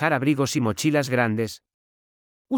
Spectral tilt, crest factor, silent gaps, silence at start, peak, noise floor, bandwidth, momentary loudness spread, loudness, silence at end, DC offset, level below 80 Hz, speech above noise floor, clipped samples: -5.5 dB/octave; 18 dB; 1.74-2.45 s; 0 s; -6 dBFS; under -90 dBFS; 19.5 kHz; 8 LU; -23 LUFS; 0 s; under 0.1%; -68 dBFS; over 67 dB; under 0.1%